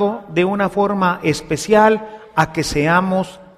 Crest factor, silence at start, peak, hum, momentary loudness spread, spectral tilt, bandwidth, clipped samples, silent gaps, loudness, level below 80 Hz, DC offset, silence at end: 16 dB; 0 s; 0 dBFS; none; 8 LU; -5.5 dB/octave; 15 kHz; under 0.1%; none; -17 LUFS; -42 dBFS; under 0.1%; 0.15 s